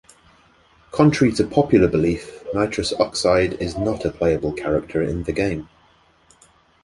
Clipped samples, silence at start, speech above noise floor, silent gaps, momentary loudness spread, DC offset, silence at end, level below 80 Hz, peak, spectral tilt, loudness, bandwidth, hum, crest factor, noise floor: under 0.1%; 0.95 s; 37 dB; none; 8 LU; under 0.1%; 1.2 s; -40 dBFS; -2 dBFS; -6 dB/octave; -20 LUFS; 11.5 kHz; none; 18 dB; -56 dBFS